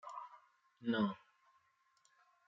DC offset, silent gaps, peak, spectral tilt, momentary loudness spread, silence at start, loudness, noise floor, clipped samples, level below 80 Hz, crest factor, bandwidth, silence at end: under 0.1%; none; -26 dBFS; -4.5 dB/octave; 18 LU; 0.05 s; -40 LUFS; -76 dBFS; under 0.1%; -88 dBFS; 20 dB; 7.6 kHz; 1.3 s